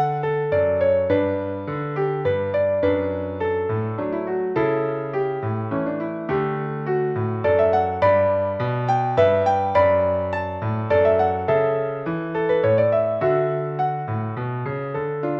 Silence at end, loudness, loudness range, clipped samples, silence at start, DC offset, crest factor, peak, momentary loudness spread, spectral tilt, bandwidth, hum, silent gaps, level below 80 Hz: 0 s; -22 LUFS; 5 LU; under 0.1%; 0 s; under 0.1%; 16 dB; -6 dBFS; 8 LU; -9 dB/octave; 6 kHz; none; none; -54 dBFS